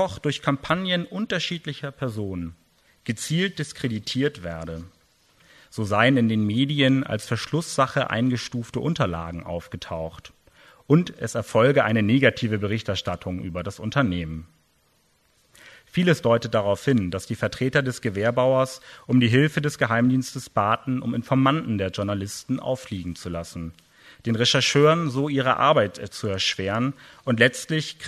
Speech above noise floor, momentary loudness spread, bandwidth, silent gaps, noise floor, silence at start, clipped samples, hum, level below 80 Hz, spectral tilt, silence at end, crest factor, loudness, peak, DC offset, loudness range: 41 dB; 14 LU; 13.5 kHz; none; -64 dBFS; 0 s; under 0.1%; none; -52 dBFS; -5.5 dB/octave; 0 s; 22 dB; -23 LUFS; -2 dBFS; under 0.1%; 7 LU